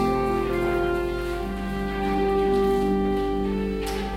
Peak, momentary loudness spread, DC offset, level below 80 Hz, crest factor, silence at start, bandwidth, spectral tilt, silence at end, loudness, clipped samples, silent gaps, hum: -12 dBFS; 7 LU; under 0.1%; -34 dBFS; 12 dB; 0 s; 16 kHz; -7 dB/octave; 0 s; -25 LUFS; under 0.1%; none; none